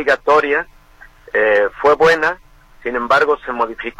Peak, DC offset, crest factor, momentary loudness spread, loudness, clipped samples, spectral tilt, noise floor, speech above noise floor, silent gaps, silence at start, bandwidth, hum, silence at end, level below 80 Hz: -2 dBFS; under 0.1%; 14 dB; 11 LU; -15 LUFS; under 0.1%; -4 dB/octave; -44 dBFS; 29 dB; none; 0 s; 11.5 kHz; none; 0.1 s; -46 dBFS